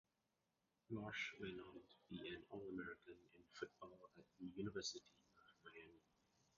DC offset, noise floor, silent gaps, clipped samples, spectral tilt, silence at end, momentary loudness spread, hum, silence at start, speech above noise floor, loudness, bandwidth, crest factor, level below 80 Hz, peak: under 0.1%; -89 dBFS; none; under 0.1%; -3.5 dB/octave; 0.6 s; 17 LU; none; 0.9 s; 35 dB; -53 LUFS; 7.2 kHz; 20 dB; -80 dBFS; -34 dBFS